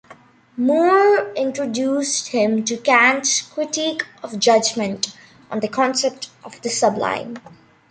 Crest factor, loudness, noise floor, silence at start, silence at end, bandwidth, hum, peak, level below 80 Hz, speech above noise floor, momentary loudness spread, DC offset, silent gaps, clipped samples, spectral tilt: 18 dB; -19 LUFS; -47 dBFS; 0.1 s; 0.5 s; 9.6 kHz; none; -2 dBFS; -66 dBFS; 28 dB; 15 LU; under 0.1%; none; under 0.1%; -2.5 dB/octave